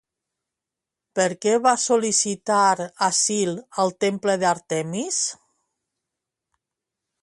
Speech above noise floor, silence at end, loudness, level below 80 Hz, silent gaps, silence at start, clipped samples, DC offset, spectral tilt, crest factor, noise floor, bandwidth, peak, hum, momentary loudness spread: 65 dB; 1.9 s; -21 LUFS; -70 dBFS; none; 1.15 s; under 0.1%; under 0.1%; -3 dB/octave; 18 dB; -87 dBFS; 11.5 kHz; -4 dBFS; none; 7 LU